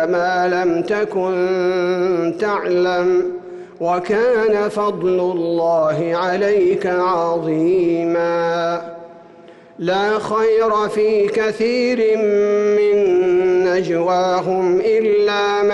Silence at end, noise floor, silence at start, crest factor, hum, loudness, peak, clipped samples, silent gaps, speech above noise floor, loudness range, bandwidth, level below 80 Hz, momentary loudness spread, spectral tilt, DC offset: 0 s; -42 dBFS; 0 s; 8 dB; none; -17 LUFS; -8 dBFS; under 0.1%; none; 26 dB; 3 LU; 11 kHz; -58 dBFS; 4 LU; -6 dB/octave; under 0.1%